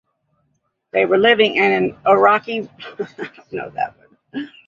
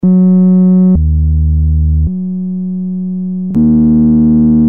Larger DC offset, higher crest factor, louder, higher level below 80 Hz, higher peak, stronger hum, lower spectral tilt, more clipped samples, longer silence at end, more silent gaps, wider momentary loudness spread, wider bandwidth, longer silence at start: second, under 0.1% vs 2%; first, 18 dB vs 6 dB; second, -16 LUFS vs -10 LUFS; second, -62 dBFS vs -18 dBFS; about the same, -2 dBFS vs -2 dBFS; neither; second, -6 dB/octave vs -15 dB/octave; neither; first, 0.2 s vs 0 s; neither; first, 18 LU vs 10 LU; first, 7.2 kHz vs 1.4 kHz; first, 0.95 s vs 0.05 s